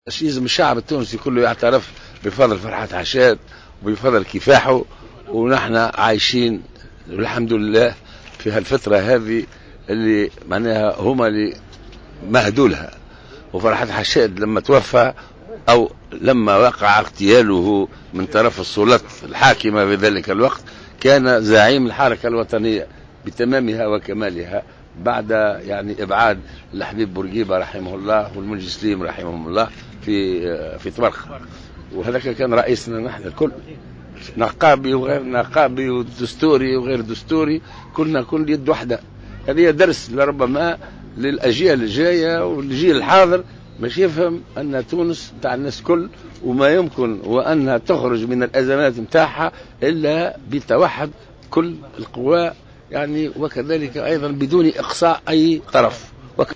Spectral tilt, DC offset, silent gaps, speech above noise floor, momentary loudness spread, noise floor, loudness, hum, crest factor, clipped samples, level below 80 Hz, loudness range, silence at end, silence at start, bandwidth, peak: -5.5 dB/octave; under 0.1%; none; 23 dB; 14 LU; -39 dBFS; -17 LUFS; none; 16 dB; under 0.1%; -44 dBFS; 6 LU; 0 s; 0.05 s; 8 kHz; -2 dBFS